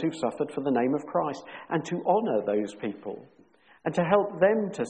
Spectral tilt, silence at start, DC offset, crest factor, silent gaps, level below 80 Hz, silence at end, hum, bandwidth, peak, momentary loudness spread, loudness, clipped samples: -7 dB/octave; 0 s; under 0.1%; 20 dB; none; -70 dBFS; 0 s; none; 9.4 kHz; -8 dBFS; 12 LU; -27 LUFS; under 0.1%